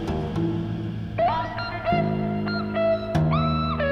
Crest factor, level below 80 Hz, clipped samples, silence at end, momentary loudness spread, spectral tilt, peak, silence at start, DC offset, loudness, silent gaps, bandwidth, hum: 14 dB; -40 dBFS; under 0.1%; 0 s; 6 LU; -8.5 dB/octave; -10 dBFS; 0 s; under 0.1%; -25 LUFS; none; 7 kHz; none